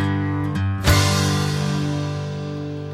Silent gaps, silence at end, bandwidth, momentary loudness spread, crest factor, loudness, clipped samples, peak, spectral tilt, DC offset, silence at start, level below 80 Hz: none; 0 s; 16 kHz; 11 LU; 18 dB; -21 LUFS; under 0.1%; -2 dBFS; -5 dB/octave; under 0.1%; 0 s; -36 dBFS